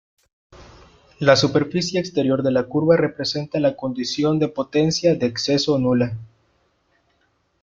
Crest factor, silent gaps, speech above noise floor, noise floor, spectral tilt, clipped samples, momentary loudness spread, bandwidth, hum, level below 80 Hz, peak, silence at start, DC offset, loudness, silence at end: 20 dB; none; 46 dB; -66 dBFS; -5.5 dB/octave; under 0.1%; 6 LU; 7.6 kHz; none; -54 dBFS; -2 dBFS; 0.6 s; under 0.1%; -20 LUFS; 1.35 s